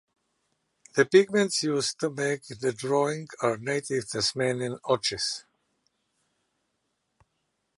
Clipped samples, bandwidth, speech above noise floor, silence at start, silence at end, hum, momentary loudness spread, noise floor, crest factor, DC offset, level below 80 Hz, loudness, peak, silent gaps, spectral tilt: under 0.1%; 11.5 kHz; 51 dB; 0.95 s; 2.35 s; none; 10 LU; -78 dBFS; 22 dB; under 0.1%; -68 dBFS; -27 LUFS; -6 dBFS; none; -4 dB/octave